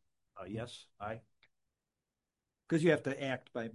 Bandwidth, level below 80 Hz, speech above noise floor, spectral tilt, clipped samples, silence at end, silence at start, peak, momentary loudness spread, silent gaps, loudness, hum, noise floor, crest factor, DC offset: 11.5 kHz; -72 dBFS; over 54 dB; -6.5 dB/octave; under 0.1%; 0 s; 0.35 s; -16 dBFS; 17 LU; none; -36 LUFS; none; under -90 dBFS; 24 dB; under 0.1%